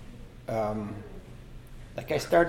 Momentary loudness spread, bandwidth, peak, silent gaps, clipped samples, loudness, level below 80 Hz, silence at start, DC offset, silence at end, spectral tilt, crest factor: 18 LU; 16.5 kHz; -10 dBFS; none; under 0.1%; -33 LUFS; -48 dBFS; 0 s; under 0.1%; 0 s; -6 dB/octave; 22 dB